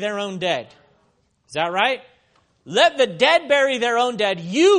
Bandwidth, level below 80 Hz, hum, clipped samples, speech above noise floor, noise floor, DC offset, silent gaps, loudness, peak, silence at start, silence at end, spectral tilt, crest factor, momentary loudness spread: 10.5 kHz; -68 dBFS; none; under 0.1%; 45 dB; -64 dBFS; under 0.1%; none; -19 LUFS; 0 dBFS; 0 s; 0 s; -3.5 dB/octave; 20 dB; 9 LU